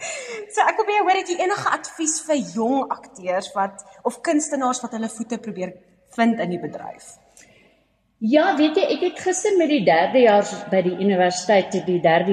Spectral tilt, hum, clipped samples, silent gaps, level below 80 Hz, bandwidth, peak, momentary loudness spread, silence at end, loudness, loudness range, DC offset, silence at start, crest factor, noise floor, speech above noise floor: -4 dB/octave; none; under 0.1%; none; -68 dBFS; 12.5 kHz; -4 dBFS; 12 LU; 0 s; -21 LUFS; 7 LU; under 0.1%; 0 s; 18 dB; -63 dBFS; 43 dB